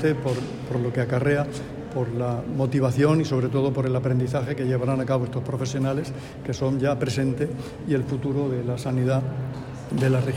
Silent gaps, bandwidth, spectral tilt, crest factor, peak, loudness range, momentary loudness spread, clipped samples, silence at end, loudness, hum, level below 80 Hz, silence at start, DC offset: none; 11.5 kHz; -7.5 dB/octave; 16 dB; -8 dBFS; 3 LU; 8 LU; under 0.1%; 0 s; -25 LUFS; none; -50 dBFS; 0 s; under 0.1%